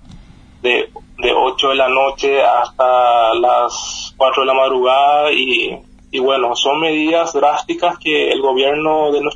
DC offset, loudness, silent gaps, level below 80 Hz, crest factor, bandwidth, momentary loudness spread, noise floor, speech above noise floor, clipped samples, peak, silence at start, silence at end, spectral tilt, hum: under 0.1%; -14 LUFS; none; -46 dBFS; 14 dB; 9.8 kHz; 7 LU; -40 dBFS; 26 dB; under 0.1%; 0 dBFS; 0.1 s; 0 s; -2.5 dB/octave; none